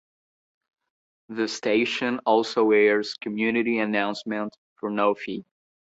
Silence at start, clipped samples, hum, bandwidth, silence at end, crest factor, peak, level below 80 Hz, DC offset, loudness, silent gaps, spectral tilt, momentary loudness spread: 1.3 s; under 0.1%; none; 8 kHz; 0.45 s; 18 dB; -6 dBFS; -70 dBFS; under 0.1%; -24 LUFS; 4.58-4.76 s; -4.5 dB/octave; 14 LU